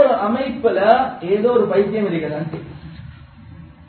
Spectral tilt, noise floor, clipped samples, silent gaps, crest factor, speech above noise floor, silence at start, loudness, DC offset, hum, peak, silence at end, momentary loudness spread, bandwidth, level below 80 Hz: -10 dB/octave; -40 dBFS; under 0.1%; none; 18 dB; 22 dB; 0 s; -18 LUFS; under 0.1%; none; 0 dBFS; 0.05 s; 21 LU; 4.5 kHz; -48 dBFS